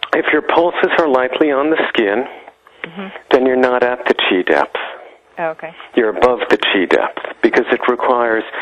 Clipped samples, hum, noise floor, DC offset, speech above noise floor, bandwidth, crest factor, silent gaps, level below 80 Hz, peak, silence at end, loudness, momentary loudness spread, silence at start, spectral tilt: under 0.1%; none; -35 dBFS; under 0.1%; 20 dB; 9.2 kHz; 16 dB; none; -54 dBFS; 0 dBFS; 0 s; -15 LUFS; 15 LU; 0 s; -5 dB/octave